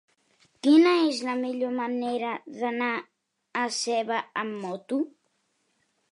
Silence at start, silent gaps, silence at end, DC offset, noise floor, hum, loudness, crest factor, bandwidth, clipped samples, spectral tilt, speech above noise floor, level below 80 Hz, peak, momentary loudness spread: 0.65 s; none; 1 s; under 0.1%; -73 dBFS; none; -26 LUFS; 18 dB; 11 kHz; under 0.1%; -3.5 dB/octave; 47 dB; -86 dBFS; -10 dBFS; 13 LU